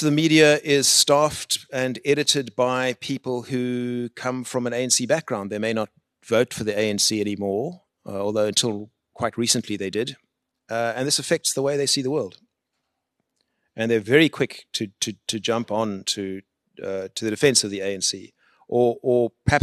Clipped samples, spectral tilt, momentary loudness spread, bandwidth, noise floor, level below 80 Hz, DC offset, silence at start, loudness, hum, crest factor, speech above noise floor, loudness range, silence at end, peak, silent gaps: under 0.1%; -3 dB/octave; 12 LU; 13 kHz; -78 dBFS; -56 dBFS; under 0.1%; 0 s; -22 LUFS; none; 22 dB; 56 dB; 4 LU; 0 s; -2 dBFS; none